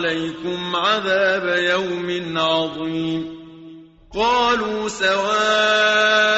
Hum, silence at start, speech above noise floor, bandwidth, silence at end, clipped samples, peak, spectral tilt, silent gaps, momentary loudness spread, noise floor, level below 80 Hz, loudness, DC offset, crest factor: none; 0 s; 23 dB; 8 kHz; 0 s; under 0.1%; -6 dBFS; -1 dB/octave; none; 11 LU; -42 dBFS; -52 dBFS; -19 LUFS; under 0.1%; 14 dB